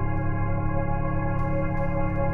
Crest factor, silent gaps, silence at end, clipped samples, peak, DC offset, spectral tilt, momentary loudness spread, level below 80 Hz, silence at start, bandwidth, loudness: 12 dB; none; 0 s; under 0.1%; -12 dBFS; under 0.1%; -11 dB/octave; 1 LU; -28 dBFS; 0 s; 3 kHz; -27 LUFS